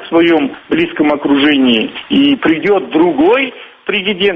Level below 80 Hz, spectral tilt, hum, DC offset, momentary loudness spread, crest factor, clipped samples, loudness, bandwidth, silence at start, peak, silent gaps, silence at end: -48 dBFS; -7 dB/octave; none; under 0.1%; 6 LU; 12 dB; under 0.1%; -12 LUFS; 5.2 kHz; 0 s; 0 dBFS; none; 0 s